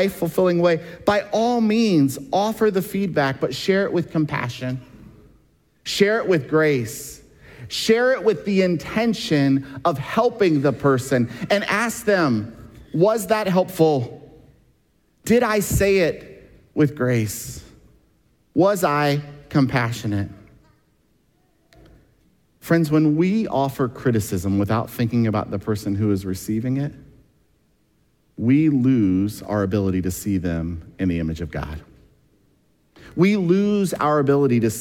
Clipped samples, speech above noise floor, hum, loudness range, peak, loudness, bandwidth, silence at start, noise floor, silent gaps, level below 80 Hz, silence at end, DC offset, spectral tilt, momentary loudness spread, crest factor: under 0.1%; 43 dB; none; 5 LU; -4 dBFS; -21 LUFS; 17.5 kHz; 0 s; -63 dBFS; none; -46 dBFS; 0 s; under 0.1%; -6 dB/octave; 10 LU; 18 dB